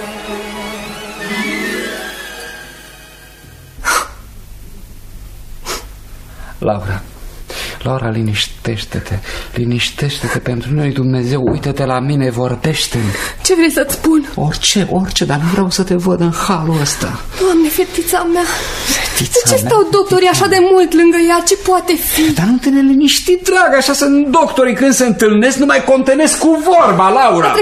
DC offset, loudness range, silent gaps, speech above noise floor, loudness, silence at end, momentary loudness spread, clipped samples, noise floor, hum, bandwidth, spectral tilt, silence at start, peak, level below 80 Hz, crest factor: under 0.1%; 13 LU; none; 25 dB; -12 LUFS; 0 s; 15 LU; under 0.1%; -37 dBFS; none; 15.5 kHz; -4.5 dB/octave; 0 s; 0 dBFS; -34 dBFS; 14 dB